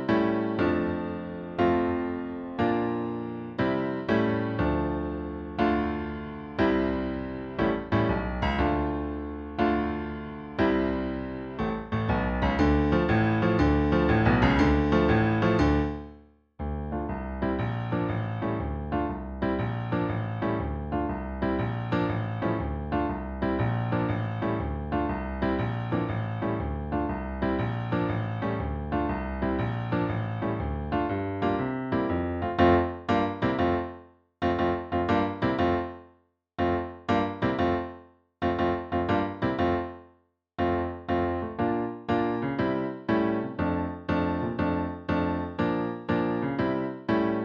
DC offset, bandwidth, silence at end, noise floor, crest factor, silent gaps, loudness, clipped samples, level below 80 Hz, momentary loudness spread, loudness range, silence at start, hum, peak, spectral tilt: under 0.1%; 7 kHz; 0 s; -64 dBFS; 18 dB; none; -28 LUFS; under 0.1%; -40 dBFS; 9 LU; 5 LU; 0 s; none; -8 dBFS; -8.5 dB/octave